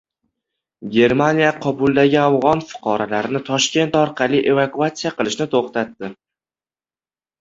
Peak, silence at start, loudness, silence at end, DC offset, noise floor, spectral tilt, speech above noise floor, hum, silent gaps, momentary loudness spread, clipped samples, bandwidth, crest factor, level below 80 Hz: -2 dBFS; 0.8 s; -18 LUFS; 1.3 s; under 0.1%; under -90 dBFS; -5 dB/octave; over 73 dB; none; none; 9 LU; under 0.1%; 8 kHz; 18 dB; -56 dBFS